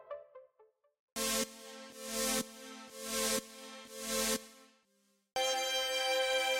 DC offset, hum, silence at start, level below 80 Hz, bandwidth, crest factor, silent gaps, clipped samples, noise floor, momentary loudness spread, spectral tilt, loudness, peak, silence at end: under 0.1%; none; 0 s; -66 dBFS; 17 kHz; 18 dB; 0.99-1.16 s; under 0.1%; -75 dBFS; 17 LU; -0.5 dB/octave; -34 LUFS; -18 dBFS; 0 s